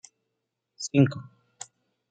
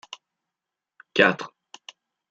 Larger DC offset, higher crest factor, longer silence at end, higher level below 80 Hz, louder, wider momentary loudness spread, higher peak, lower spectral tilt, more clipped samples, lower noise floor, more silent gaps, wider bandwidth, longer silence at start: neither; about the same, 22 dB vs 26 dB; about the same, 0.9 s vs 0.85 s; about the same, -72 dBFS vs -68 dBFS; second, -25 LUFS vs -22 LUFS; second, 21 LU vs 25 LU; second, -8 dBFS vs -2 dBFS; first, -6 dB/octave vs -4.5 dB/octave; neither; second, -82 dBFS vs -87 dBFS; neither; first, 9.4 kHz vs 8 kHz; second, 0.8 s vs 1.15 s